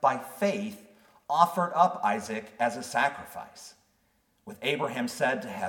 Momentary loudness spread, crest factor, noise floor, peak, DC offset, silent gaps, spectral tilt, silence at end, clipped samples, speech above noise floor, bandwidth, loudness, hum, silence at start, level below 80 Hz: 22 LU; 24 dB; -70 dBFS; -6 dBFS; under 0.1%; none; -4 dB/octave; 0 s; under 0.1%; 42 dB; 18 kHz; -28 LUFS; none; 0 s; -74 dBFS